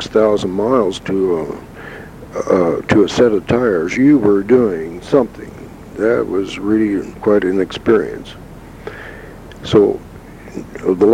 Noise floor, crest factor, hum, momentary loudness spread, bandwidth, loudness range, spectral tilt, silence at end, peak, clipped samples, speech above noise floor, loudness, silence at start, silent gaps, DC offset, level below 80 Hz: -35 dBFS; 16 dB; none; 20 LU; 12 kHz; 4 LU; -6.5 dB/octave; 0 s; 0 dBFS; under 0.1%; 20 dB; -15 LUFS; 0 s; none; under 0.1%; -42 dBFS